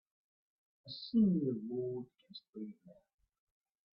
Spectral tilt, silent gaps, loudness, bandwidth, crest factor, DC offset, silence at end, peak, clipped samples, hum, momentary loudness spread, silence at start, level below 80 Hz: -9.5 dB/octave; 2.49-2.53 s; -36 LUFS; 5.6 kHz; 18 dB; under 0.1%; 1 s; -22 dBFS; under 0.1%; none; 21 LU; 0.85 s; -76 dBFS